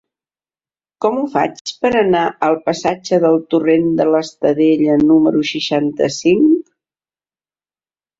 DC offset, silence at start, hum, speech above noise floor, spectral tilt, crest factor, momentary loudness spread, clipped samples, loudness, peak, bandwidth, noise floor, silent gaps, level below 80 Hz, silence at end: under 0.1%; 1 s; none; over 76 dB; -5.5 dB/octave; 14 dB; 7 LU; under 0.1%; -15 LUFS; -2 dBFS; 7.8 kHz; under -90 dBFS; 1.61-1.65 s; -56 dBFS; 1.6 s